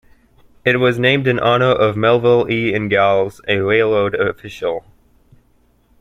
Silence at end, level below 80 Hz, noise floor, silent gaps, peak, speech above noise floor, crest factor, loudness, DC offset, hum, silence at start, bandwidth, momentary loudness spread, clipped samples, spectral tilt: 1.2 s; -50 dBFS; -56 dBFS; none; 0 dBFS; 41 dB; 16 dB; -15 LUFS; under 0.1%; none; 0.65 s; 13 kHz; 9 LU; under 0.1%; -7 dB/octave